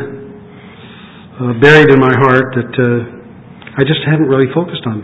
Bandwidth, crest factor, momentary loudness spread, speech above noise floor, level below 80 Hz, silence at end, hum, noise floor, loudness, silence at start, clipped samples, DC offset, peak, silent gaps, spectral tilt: 8 kHz; 12 dB; 18 LU; 25 dB; -46 dBFS; 0 s; none; -35 dBFS; -10 LUFS; 0 s; 0.6%; under 0.1%; 0 dBFS; none; -7.5 dB/octave